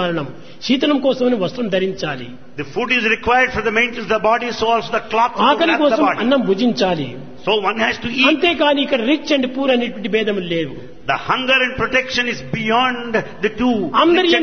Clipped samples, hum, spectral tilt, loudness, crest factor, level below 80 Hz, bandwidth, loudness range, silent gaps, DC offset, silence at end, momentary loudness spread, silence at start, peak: under 0.1%; none; -5 dB/octave; -17 LUFS; 16 dB; -46 dBFS; 6.6 kHz; 2 LU; none; 1%; 0 s; 9 LU; 0 s; 0 dBFS